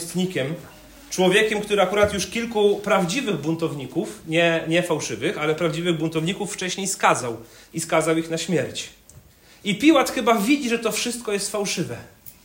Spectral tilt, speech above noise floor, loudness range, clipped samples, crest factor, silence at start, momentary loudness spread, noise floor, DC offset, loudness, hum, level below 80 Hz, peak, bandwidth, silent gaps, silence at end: -4 dB/octave; 27 dB; 3 LU; under 0.1%; 20 dB; 0 s; 12 LU; -50 dBFS; under 0.1%; -22 LUFS; none; -56 dBFS; -4 dBFS; 16.5 kHz; none; 0.15 s